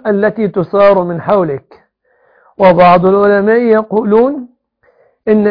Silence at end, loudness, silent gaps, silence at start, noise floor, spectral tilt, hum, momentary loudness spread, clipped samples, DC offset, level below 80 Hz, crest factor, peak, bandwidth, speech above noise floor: 0 s; -10 LUFS; none; 0.05 s; -54 dBFS; -10 dB/octave; none; 9 LU; 0.2%; under 0.1%; -46 dBFS; 10 dB; 0 dBFS; 5.2 kHz; 45 dB